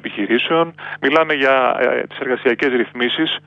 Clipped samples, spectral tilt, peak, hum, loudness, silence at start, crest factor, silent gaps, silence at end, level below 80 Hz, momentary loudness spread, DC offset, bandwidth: under 0.1%; -6 dB/octave; -2 dBFS; 50 Hz at -50 dBFS; -17 LUFS; 0.05 s; 14 dB; none; 0.1 s; -66 dBFS; 7 LU; under 0.1%; 7.6 kHz